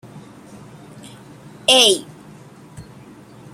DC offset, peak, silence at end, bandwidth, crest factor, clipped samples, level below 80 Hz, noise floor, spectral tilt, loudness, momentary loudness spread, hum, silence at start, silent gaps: under 0.1%; 0 dBFS; 0.75 s; 16.5 kHz; 22 dB; under 0.1%; -60 dBFS; -42 dBFS; -1.5 dB/octave; -14 LUFS; 29 LU; none; 0.15 s; none